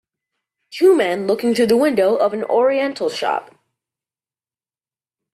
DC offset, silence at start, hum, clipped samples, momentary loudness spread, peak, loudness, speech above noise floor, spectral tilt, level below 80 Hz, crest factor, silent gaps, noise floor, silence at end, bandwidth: under 0.1%; 0.7 s; none; under 0.1%; 8 LU; -4 dBFS; -17 LUFS; over 74 dB; -5 dB/octave; -66 dBFS; 16 dB; none; under -90 dBFS; 1.9 s; 14 kHz